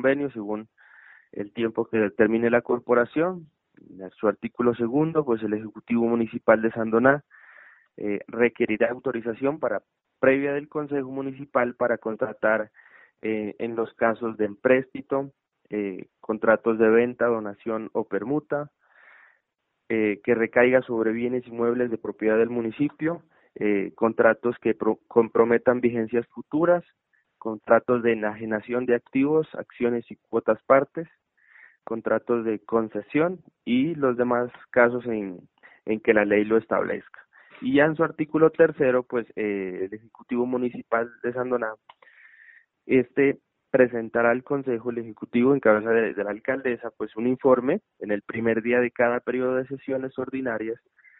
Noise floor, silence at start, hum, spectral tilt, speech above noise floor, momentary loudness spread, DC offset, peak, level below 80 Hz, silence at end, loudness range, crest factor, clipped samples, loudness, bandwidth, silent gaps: -78 dBFS; 0 s; none; -5.5 dB/octave; 54 dB; 12 LU; under 0.1%; -4 dBFS; -64 dBFS; 0.45 s; 4 LU; 22 dB; under 0.1%; -24 LUFS; 4 kHz; none